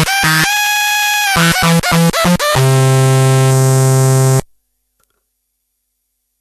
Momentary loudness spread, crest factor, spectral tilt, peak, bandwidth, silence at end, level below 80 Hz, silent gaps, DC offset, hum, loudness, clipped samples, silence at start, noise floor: 1 LU; 12 dB; -4.5 dB/octave; 0 dBFS; 13.5 kHz; 1.95 s; -38 dBFS; none; under 0.1%; none; -11 LUFS; under 0.1%; 0 s; -69 dBFS